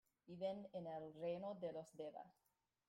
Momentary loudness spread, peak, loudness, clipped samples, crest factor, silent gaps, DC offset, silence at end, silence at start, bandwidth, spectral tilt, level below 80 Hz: 11 LU; -36 dBFS; -50 LUFS; under 0.1%; 16 dB; none; under 0.1%; 0.6 s; 0.25 s; 15.5 kHz; -7 dB/octave; -88 dBFS